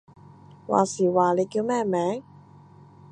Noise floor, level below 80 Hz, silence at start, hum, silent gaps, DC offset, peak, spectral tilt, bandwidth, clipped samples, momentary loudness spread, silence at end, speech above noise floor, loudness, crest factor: -50 dBFS; -68 dBFS; 0.7 s; none; none; under 0.1%; -6 dBFS; -6 dB/octave; 10 kHz; under 0.1%; 9 LU; 0.9 s; 27 dB; -24 LUFS; 20 dB